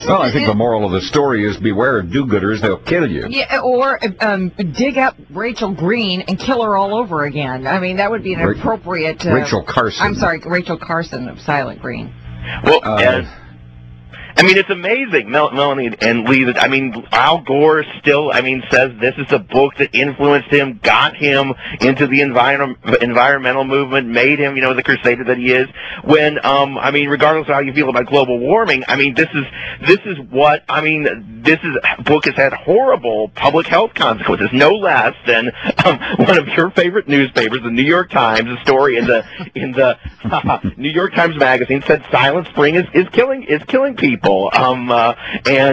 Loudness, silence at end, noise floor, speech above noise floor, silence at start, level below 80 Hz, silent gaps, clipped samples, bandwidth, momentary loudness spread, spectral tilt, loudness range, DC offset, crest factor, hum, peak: -14 LUFS; 0 s; -37 dBFS; 22 dB; 0 s; -42 dBFS; none; under 0.1%; 8 kHz; 7 LU; -5.5 dB/octave; 4 LU; under 0.1%; 14 dB; none; 0 dBFS